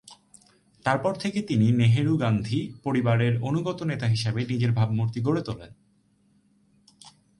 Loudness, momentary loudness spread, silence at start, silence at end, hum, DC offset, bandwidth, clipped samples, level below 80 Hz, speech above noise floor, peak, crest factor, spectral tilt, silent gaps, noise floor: -25 LUFS; 8 LU; 0.1 s; 0.3 s; none; under 0.1%; 11.5 kHz; under 0.1%; -56 dBFS; 40 dB; -8 dBFS; 18 dB; -7.5 dB/octave; none; -64 dBFS